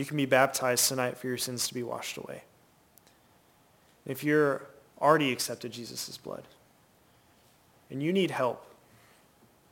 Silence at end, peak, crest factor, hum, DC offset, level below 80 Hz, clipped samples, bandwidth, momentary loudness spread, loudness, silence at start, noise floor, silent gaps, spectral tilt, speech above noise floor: 1.05 s; -8 dBFS; 24 dB; none; under 0.1%; -74 dBFS; under 0.1%; 17 kHz; 18 LU; -29 LUFS; 0 s; -63 dBFS; none; -3.5 dB/octave; 34 dB